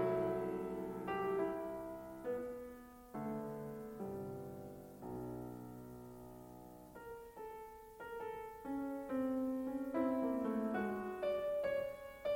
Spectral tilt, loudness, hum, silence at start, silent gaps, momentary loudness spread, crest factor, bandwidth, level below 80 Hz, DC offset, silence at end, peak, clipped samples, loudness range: -7.5 dB/octave; -42 LUFS; none; 0 s; none; 15 LU; 16 dB; 16.5 kHz; -68 dBFS; under 0.1%; 0 s; -26 dBFS; under 0.1%; 12 LU